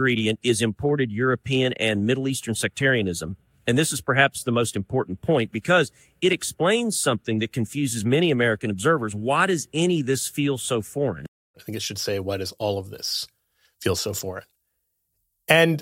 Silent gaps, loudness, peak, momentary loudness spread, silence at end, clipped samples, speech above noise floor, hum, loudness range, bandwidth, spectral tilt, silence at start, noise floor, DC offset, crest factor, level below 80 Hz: 11.28-11.54 s; -23 LUFS; -2 dBFS; 9 LU; 0 s; under 0.1%; 52 dB; none; 6 LU; 17 kHz; -4.5 dB/octave; 0 s; -75 dBFS; under 0.1%; 22 dB; -60 dBFS